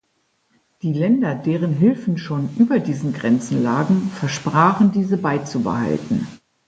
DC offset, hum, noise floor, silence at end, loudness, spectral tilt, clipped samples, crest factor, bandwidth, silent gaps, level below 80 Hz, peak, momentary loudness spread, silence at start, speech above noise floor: under 0.1%; none; -67 dBFS; 0.3 s; -19 LUFS; -7 dB/octave; under 0.1%; 18 dB; 9 kHz; none; -56 dBFS; -2 dBFS; 8 LU; 0.85 s; 49 dB